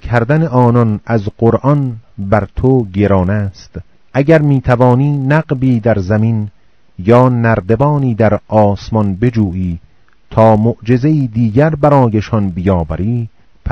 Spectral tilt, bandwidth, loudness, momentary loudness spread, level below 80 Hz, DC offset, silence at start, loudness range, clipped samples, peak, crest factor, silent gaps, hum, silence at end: -9.5 dB/octave; 6.4 kHz; -12 LUFS; 10 LU; -34 dBFS; 0.6%; 0 s; 1 LU; 0.7%; 0 dBFS; 12 dB; none; none; 0 s